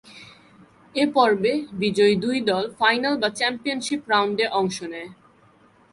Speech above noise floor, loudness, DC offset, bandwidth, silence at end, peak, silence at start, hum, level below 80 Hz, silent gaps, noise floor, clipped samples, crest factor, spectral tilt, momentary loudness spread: 34 dB; -22 LUFS; under 0.1%; 11.5 kHz; 0.8 s; -4 dBFS; 0.05 s; none; -64 dBFS; none; -56 dBFS; under 0.1%; 20 dB; -4 dB/octave; 10 LU